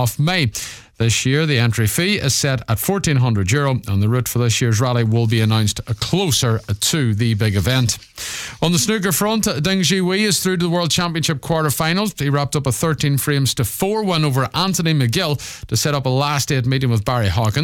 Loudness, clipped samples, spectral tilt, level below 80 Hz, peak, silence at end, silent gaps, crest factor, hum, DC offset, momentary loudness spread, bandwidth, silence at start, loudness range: -18 LUFS; under 0.1%; -4.5 dB/octave; -42 dBFS; -4 dBFS; 0 s; none; 12 dB; none; under 0.1%; 4 LU; 18 kHz; 0 s; 1 LU